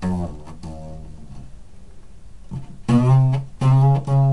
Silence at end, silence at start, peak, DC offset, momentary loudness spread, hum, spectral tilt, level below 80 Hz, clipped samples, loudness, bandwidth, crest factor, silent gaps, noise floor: 0 s; 0 s; -4 dBFS; 1%; 23 LU; none; -9 dB/octave; -42 dBFS; under 0.1%; -18 LUFS; 10.5 kHz; 16 dB; none; -42 dBFS